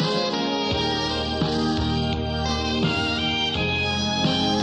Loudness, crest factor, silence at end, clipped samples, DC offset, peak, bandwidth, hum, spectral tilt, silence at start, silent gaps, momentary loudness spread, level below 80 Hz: -23 LUFS; 14 dB; 0 s; under 0.1%; under 0.1%; -10 dBFS; 10 kHz; none; -5 dB/octave; 0 s; none; 3 LU; -38 dBFS